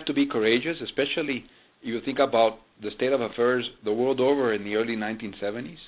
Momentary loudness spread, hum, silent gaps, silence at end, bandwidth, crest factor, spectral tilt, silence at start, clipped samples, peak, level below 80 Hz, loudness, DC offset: 10 LU; none; none; 0 s; 4 kHz; 18 dB; -9 dB/octave; 0 s; under 0.1%; -8 dBFS; -62 dBFS; -26 LUFS; under 0.1%